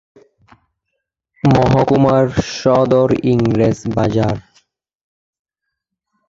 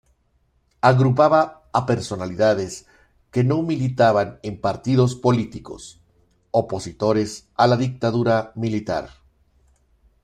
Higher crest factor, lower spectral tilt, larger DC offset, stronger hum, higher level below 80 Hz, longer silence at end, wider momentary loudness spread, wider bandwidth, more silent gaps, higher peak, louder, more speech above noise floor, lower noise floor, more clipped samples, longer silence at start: second, 14 dB vs 20 dB; about the same, -7.5 dB/octave vs -7 dB/octave; neither; neither; first, -40 dBFS vs -54 dBFS; first, 1.9 s vs 1.15 s; second, 6 LU vs 13 LU; second, 7.8 kHz vs 10.5 kHz; neither; about the same, -2 dBFS vs -2 dBFS; first, -14 LUFS vs -21 LUFS; first, 65 dB vs 45 dB; first, -78 dBFS vs -64 dBFS; neither; first, 1.45 s vs 0.85 s